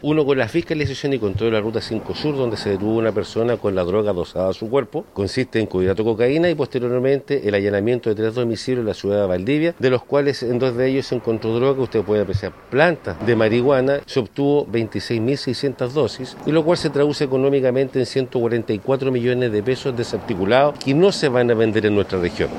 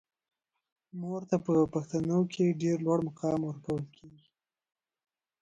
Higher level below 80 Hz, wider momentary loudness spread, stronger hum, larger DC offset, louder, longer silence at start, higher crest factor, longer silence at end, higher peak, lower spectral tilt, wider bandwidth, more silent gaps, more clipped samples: first, -48 dBFS vs -66 dBFS; second, 6 LU vs 10 LU; neither; neither; first, -20 LUFS vs -31 LUFS; second, 0 s vs 0.95 s; about the same, 18 dB vs 18 dB; second, 0 s vs 1.3 s; first, -2 dBFS vs -14 dBFS; second, -6.5 dB/octave vs -8 dB/octave; first, 12 kHz vs 8.8 kHz; neither; neither